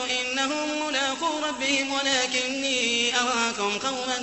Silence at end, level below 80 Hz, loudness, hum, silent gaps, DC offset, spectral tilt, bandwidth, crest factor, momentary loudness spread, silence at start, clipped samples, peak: 0 s; -64 dBFS; -24 LUFS; none; none; under 0.1%; -0.5 dB/octave; 8.4 kHz; 18 dB; 5 LU; 0 s; under 0.1%; -8 dBFS